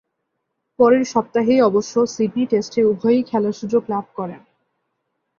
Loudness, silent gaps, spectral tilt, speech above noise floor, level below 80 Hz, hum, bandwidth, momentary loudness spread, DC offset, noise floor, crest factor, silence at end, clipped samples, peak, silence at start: -18 LUFS; none; -6 dB/octave; 58 dB; -62 dBFS; none; 7.4 kHz; 10 LU; under 0.1%; -75 dBFS; 16 dB; 1 s; under 0.1%; -4 dBFS; 0.8 s